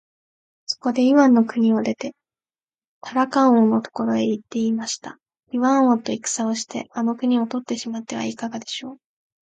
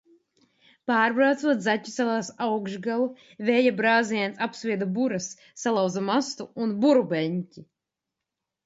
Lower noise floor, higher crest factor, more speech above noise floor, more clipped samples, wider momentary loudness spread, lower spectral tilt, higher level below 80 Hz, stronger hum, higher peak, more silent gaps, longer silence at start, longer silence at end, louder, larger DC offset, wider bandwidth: first, under -90 dBFS vs -86 dBFS; about the same, 16 dB vs 18 dB; first, over 70 dB vs 61 dB; neither; first, 15 LU vs 10 LU; about the same, -4.5 dB/octave vs -5 dB/octave; about the same, -70 dBFS vs -74 dBFS; neither; about the same, -6 dBFS vs -8 dBFS; first, 2.63-2.67 s, 2.87-3.01 s vs none; second, 0.7 s vs 0.85 s; second, 0.5 s vs 1 s; first, -21 LUFS vs -25 LUFS; neither; first, 9.2 kHz vs 8 kHz